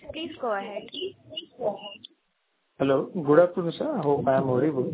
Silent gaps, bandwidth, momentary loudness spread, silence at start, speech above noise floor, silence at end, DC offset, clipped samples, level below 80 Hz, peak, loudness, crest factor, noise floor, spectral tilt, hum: none; 4 kHz; 18 LU; 0.05 s; 49 dB; 0 s; under 0.1%; under 0.1%; -64 dBFS; -6 dBFS; -26 LUFS; 20 dB; -74 dBFS; -10.5 dB/octave; none